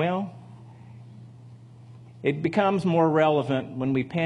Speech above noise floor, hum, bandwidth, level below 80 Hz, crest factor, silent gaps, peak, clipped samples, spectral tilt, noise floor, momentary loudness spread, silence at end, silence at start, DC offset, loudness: 23 dB; none; 11 kHz; -64 dBFS; 18 dB; none; -8 dBFS; under 0.1%; -8 dB/octave; -47 dBFS; 25 LU; 0 s; 0 s; under 0.1%; -24 LUFS